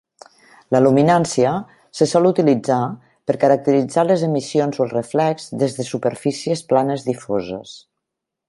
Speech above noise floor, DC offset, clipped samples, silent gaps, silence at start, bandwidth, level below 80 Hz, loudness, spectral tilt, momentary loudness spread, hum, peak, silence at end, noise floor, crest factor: 64 dB; under 0.1%; under 0.1%; none; 0.7 s; 11.5 kHz; -60 dBFS; -18 LUFS; -6 dB/octave; 10 LU; none; -2 dBFS; 0.7 s; -81 dBFS; 16 dB